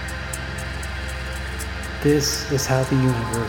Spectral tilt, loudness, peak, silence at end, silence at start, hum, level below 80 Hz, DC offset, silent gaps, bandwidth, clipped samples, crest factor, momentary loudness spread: -4.5 dB/octave; -23 LUFS; -6 dBFS; 0 s; 0 s; none; -34 dBFS; under 0.1%; none; 19 kHz; under 0.1%; 18 dB; 10 LU